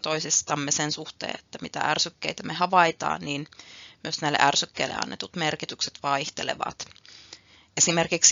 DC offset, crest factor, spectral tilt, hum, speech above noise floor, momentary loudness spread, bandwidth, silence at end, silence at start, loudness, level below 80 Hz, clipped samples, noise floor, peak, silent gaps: under 0.1%; 24 dB; -1.5 dB/octave; none; 24 dB; 17 LU; 7.8 kHz; 0 s; 0.05 s; -25 LUFS; -66 dBFS; under 0.1%; -51 dBFS; -2 dBFS; none